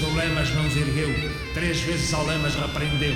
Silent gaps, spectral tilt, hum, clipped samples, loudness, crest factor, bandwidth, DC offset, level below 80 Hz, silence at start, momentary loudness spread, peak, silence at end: none; -4.5 dB/octave; none; under 0.1%; -24 LUFS; 14 dB; 16 kHz; under 0.1%; -34 dBFS; 0 s; 3 LU; -10 dBFS; 0 s